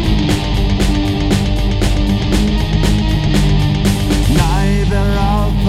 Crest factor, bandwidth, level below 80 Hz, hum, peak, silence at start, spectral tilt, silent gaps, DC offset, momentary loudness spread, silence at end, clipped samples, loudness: 12 dB; 15 kHz; -16 dBFS; none; 0 dBFS; 0 s; -6 dB/octave; none; under 0.1%; 2 LU; 0 s; under 0.1%; -15 LUFS